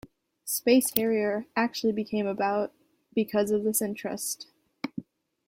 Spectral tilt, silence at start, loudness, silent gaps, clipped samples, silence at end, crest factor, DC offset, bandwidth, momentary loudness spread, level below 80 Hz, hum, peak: -4 dB/octave; 0.45 s; -28 LUFS; none; under 0.1%; 0.45 s; 28 dB; under 0.1%; 16.5 kHz; 15 LU; -68 dBFS; none; 0 dBFS